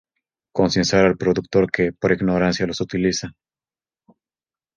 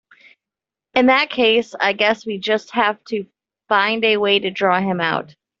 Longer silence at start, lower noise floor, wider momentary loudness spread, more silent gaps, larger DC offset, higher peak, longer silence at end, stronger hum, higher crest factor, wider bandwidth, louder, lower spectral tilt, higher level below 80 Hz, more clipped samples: second, 0.55 s vs 0.95 s; about the same, under -90 dBFS vs -87 dBFS; about the same, 7 LU vs 8 LU; neither; neither; about the same, -2 dBFS vs -2 dBFS; first, 1.45 s vs 0.35 s; neither; about the same, 20 dB vs 18 dB; first, 9 kHz vs 7.6 kHz; about the same, -20 LUFS vs -18 LUFS; about the same, -5 dB/octave vs -5 dB/octave; first, -46 dBFS vs -64 dBFS; neither